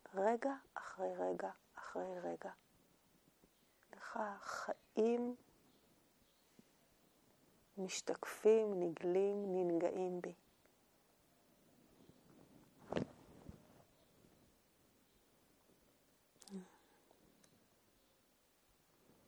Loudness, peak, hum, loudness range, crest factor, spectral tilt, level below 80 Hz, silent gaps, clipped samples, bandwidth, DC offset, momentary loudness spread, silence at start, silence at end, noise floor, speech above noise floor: -41 LUFS; -22 dBFS; none; 24 LU; 22 dB; -5.5 dB/octave; -80 dBFS; none; under 0.1%; over 20 kHz; under 0.1%; 18 LU; 0.1 s; 2.6 s; -75 dBFS; 35 dB